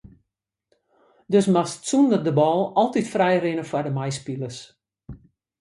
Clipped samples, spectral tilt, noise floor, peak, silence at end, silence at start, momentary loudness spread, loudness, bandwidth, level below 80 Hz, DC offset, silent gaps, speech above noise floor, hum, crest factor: under 0.1%; -6 dB/octave; -83 dBFS; -6 dBFS; 0.45 s; 1.3 s; 12 LU; -22 LUFS; 11.5 kHz; -60 dBFS; under 0.1%; none; 62 dB; none; 18 dB